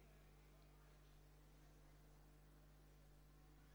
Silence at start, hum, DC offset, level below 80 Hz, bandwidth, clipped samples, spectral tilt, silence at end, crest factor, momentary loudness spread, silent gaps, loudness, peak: 0 s; 50 Hz at -70 dBFS; under 0.1%; -70 dBFS; over 20 kHz; under 0.1%; -5 dB/octave; 0 s; 10 dB; 0 LU; none; -70 LUFS; -56 dBFS